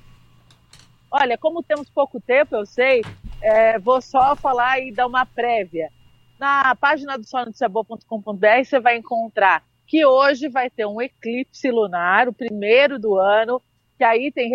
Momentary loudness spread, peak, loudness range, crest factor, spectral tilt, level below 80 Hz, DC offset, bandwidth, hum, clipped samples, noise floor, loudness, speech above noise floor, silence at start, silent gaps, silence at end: 11 LU; -2 dBFS; 3 LU; 18 dB; -5 dB/octave; -50 dBFS; under 0.1%; 8.2 kHz; none; under 0.1%; -53 dBFS; -19 LUFS; 34 dB; 1.1 s; none; 0 s